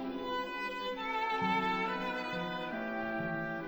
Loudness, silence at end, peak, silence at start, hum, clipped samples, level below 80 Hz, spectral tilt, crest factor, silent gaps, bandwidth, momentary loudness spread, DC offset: -35 LUFS; 0 s; -20 dBFS; 0 s; none; under 0.1%; -62 dBFS; -5.5 dB/octave; 16 dB; none; over 20 kHz; 6 LU; under 0.1%